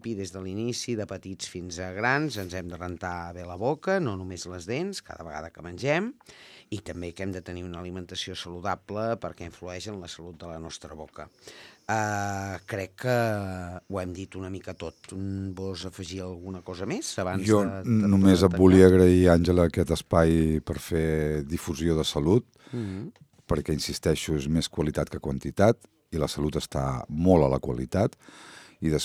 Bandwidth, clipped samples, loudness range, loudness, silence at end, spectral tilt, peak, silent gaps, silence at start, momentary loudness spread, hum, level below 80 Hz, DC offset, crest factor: 15 kHz; under 0.1%; 14 LU; -26 LUFS; 0 s; -6 dB/octave; -2 dBFS; none; 0.05 s; 18 LU; none; -44 dBFS; under 0.1%; 24 dB